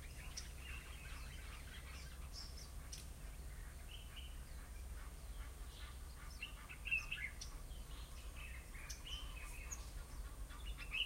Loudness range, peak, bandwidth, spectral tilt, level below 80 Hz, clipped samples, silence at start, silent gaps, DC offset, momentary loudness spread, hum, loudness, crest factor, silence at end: 6 LU; -28 dBFS; 16 kHz; -2.5 dB/octave; -52 dBFS; under 0.1%; 0 s; none; under 0.1%; 8 LU; none; -50 LUFS; 22 dB; 0 s